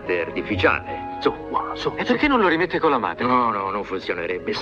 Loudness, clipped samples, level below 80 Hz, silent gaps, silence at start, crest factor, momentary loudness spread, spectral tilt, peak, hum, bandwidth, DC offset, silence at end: -22 LUFS; under 0.1%; -48 dBFS; none; 0 s; 18 dB; 8 LU; -6 dB/octave; -4 dBFS; none; 7.6 kHz; under 0.1%; 0 s